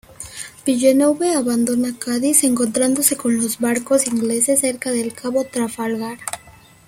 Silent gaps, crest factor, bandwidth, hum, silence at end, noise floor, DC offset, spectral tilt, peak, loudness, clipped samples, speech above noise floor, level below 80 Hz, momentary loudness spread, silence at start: none; 18 dB; 16.5 kHz; none; 0.4 s; -46 dBFS; under 0.1%; -3 dB/octave; 0 dBFS; -18 LUFS; under 0.1%; 28 dB; -58 dBFS; 12 LU; 0.2 s